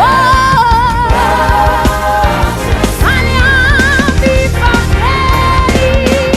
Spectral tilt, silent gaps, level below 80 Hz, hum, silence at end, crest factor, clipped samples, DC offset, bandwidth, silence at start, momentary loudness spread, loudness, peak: -5 dB/octave; none; -16 dBFS; none; 0 s; 8 dB; under 0.1%; under 0.1%; 15.5 kHz; 0 s; 4 LU; -9 LUFS; 0 dBFS